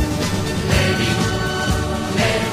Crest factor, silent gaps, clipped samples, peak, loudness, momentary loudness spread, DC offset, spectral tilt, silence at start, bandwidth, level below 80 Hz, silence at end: 16 dB; none; under 0.1%; -4 dBFS; -19 LUFS; 4 LU; under 0.1%; -4.5 dB/octave; 0 s; 15.5 kHz; -30 dBFS; 0 s